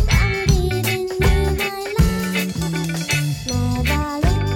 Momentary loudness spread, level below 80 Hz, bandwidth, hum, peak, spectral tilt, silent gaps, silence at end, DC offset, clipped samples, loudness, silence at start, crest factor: 5 LU; -24 dBFS; 17 kHz; none; -4 dBFS; -5 dB/octave; none; 0 s; under 0.1%; under 0.1%; -20 LUFS; 0 s; 14 dB